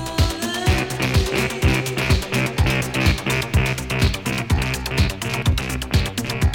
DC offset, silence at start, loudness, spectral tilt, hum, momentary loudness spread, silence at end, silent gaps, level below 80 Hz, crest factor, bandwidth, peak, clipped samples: under 0.1%; 0 s; -21 LUFS; -5 dB/octave; none; 3 LU; 0 s; none; -26 dBFS; 16 dB; 17.5 kHz; -4 dBFS; under 0.1%